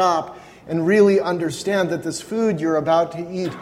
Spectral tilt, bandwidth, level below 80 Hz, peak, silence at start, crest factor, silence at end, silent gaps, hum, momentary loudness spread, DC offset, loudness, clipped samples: -5.5 dB/octave; 15 kHz; -58 dBFS; -4 dBFS; 0 s; 16 dB; 0 s; none; none; 11 LU; under 0.1%; -20 LUFS; under 0.1%